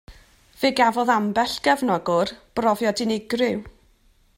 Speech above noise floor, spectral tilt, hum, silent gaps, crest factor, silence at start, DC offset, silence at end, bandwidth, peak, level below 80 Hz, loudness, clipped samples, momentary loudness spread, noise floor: 37 dB; -4.5 dB/octave; none; none; 18 dB; 0.1 s; under 0.1%; 0.7 s; 16 kHz; -4 dBFS; -54 dBFS; -22 LUFS; under 0.1%; 6 LU; -59 dBFS